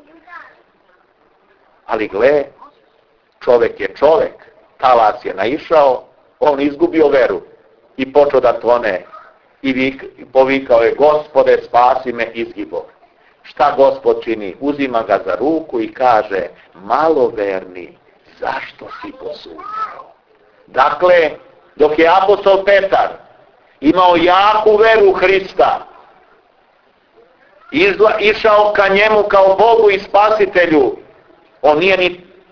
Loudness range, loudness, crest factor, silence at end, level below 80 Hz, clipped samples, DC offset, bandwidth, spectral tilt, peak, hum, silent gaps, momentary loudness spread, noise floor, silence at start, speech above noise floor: 7 LU; -13 LUFS; 14 dB; 0.35 s; -48 dBFS; under 0.1%; under 0.1%; 5.4 kHz; -6 dB/octave; 0 dBFS; none; none; 14 LU; -55 dBFS; 0.3 s; 42 dB